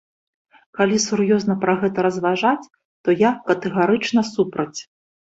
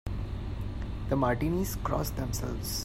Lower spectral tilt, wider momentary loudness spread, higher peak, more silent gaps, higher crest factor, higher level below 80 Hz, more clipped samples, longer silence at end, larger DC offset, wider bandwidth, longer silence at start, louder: about the same, -5 dB/octave vs -5.5 dB/octave; about the same, 9 LU vs 9 LU; first, -2 dBFS vs -14 dBFS; first, 2.85-3.04 s vs none; about the same, 18 dB vs 18 dB; second, -62 dBFS vs -38 dBFS; neither; first, 0.5 s vs 0 s; neither; second, 8 kHz vs 16 kHz; first, 0.75 s vs 0.05 s; first, -20 LUFS vs -32 LUFS